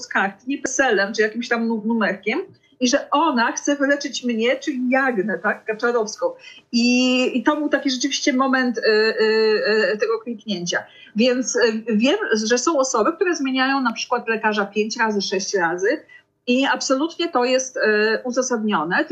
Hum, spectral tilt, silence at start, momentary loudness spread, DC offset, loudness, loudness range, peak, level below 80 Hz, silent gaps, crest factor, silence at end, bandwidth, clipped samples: none; -3 dB/octave; 0 s; 6 LU; under 0.1%; -20 LUFS; 2 LU; -6 dBFS; -68 dBFS; none; 14 dB; 0 s; 8.6 kHz; under 0.1%